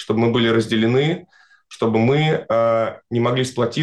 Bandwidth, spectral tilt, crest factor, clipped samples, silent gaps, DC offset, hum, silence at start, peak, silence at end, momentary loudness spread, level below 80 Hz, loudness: 12 kHz; -6.5 dB/octave; 10 dB; under 0.1%; none; under 0.1%; none; 0 s; -8 dBFS; 0 s; 6 LU; -58 dBFS; -19 LUFS